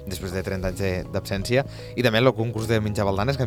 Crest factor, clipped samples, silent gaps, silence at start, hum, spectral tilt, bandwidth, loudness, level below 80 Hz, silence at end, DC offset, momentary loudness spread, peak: 18 dB; under 0.1%; none; 0 s; none; -6 dB/octave; 18 kHz; -24 LUFS; -42 dBFS; 0 s; 0.1%; 9 LU; -4 dBFS